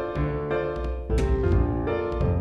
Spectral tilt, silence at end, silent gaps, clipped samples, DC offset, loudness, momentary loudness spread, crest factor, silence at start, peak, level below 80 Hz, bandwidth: -8.5 dB/octave; 0 s; none; under 0.1%; under 0.1%; -26 LUFS; 5 LU; 14 dB; 0 s; -12 dBFS; -30 dBFS; 9.4 kHz